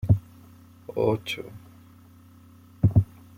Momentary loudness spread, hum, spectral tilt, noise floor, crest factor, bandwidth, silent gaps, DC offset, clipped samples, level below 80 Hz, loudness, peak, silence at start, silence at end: 21 LU; none; -8 dB/octave; -51 dBFS; 20 dB; 15.5 kHz; none; under 0.1%; under 0.1%; -46 dBFS; -26 LUFS; -6 dBFS; 0.05 s; 0.35 s